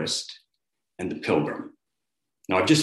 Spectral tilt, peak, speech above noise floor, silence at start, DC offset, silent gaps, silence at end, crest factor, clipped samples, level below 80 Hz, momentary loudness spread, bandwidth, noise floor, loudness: -4 dB/octave; -6 dBFS; 61 dB; 0 s; under 0.1%; none; 0 s; 22 dB; under 0.1%; -66 dBFS; 21 LU; 12.5 kHz; -85 dBFS; -27 LUFS